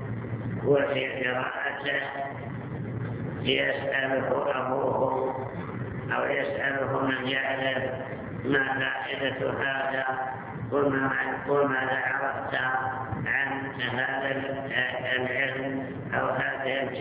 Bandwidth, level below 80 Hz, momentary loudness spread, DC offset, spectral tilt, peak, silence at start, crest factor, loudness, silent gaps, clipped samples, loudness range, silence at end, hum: 4 kHz; -56 dBFS; 9 LU; under 0.1%; -3 dB/octave; -10 dBFS; 0 s; 20 dB; -28 LUFS; none; under 0.1%; 2 LU; 0 s; none